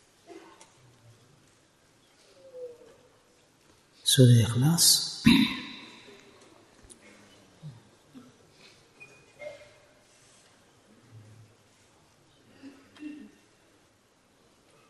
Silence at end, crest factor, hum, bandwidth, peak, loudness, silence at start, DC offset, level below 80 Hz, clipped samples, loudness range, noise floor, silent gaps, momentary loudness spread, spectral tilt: 1.75 s; 24 dB; none; 12.5 kHz; -6 dBFS; -22 LUFS; 0.35 s; under 0.1%; -60 dBFS; under 0.1%; 9 LU; -64 dBFS; none; 30 LU; -4 dB/octave